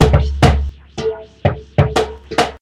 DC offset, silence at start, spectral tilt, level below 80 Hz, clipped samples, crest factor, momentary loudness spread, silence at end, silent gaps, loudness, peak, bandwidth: under 0.1%; 0 s; -6 dB/octave; -22 dBFS; 0.1%; 16 dB; 10 LU; 0.05 s; none; -17 LUFS; 0 dBFS; 13 kHz